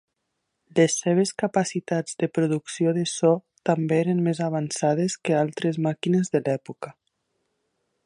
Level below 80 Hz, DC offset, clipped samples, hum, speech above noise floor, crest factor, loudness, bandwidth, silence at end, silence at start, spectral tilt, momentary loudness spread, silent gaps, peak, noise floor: -72 dBFS; under 0.1%; under 0.1%; none; 55 dB; 18 dB; -24 LUFS; 11.5 kHz; 1.15 s; 0.75 s; -5.5 dB/octave; 6 LU; none; -6 dBFS; -78 dBFS